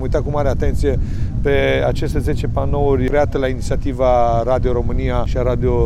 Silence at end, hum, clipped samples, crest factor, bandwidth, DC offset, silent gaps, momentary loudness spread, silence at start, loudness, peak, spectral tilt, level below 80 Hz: 0 s; none; under 0.1%; 12 dB; 12.5 kHz; under 0.1%; none; 5 LU; 0 s; -18 LUFS; -4 dBFS; -7.5 dB/octave; -22 dBFS